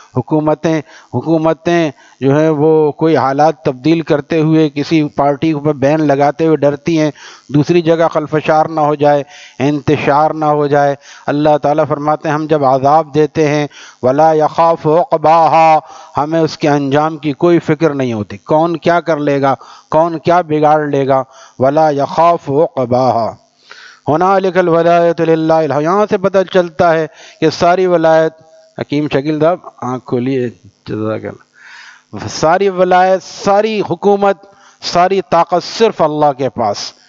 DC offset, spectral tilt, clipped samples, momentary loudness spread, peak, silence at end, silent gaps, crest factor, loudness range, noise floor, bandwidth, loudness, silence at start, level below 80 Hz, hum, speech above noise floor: under 0.1%; -6.5 dB/octave; under 0.1%; 8 LU; 0 dBFS; 0.2 s; none; 12 dB; 3 LU; -38 dBFS; 7.6 kHz; -12 LUFS; 0.15 s; -52 dBFS; none; 26 dB